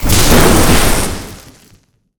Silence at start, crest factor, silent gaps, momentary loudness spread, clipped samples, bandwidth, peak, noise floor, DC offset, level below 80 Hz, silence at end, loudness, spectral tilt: 0 s; 10 dB; none; 17 LU; under 0.1%; over 20 kHz; 0 dBFS; -50 dBFS; under 0.1%; -18 dBFS; 0.7 s; -10 LUFS; -4 dB/octave